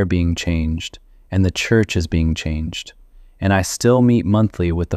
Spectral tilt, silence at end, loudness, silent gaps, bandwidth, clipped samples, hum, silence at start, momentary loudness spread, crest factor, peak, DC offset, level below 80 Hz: -6 dB/octave; 0 s; -18 LUFS; none; 14 kHz; under 0.1%; none; 0 s; 12 LU; 16 dB; -2 dBFS; under 0.1%; -30 dBFS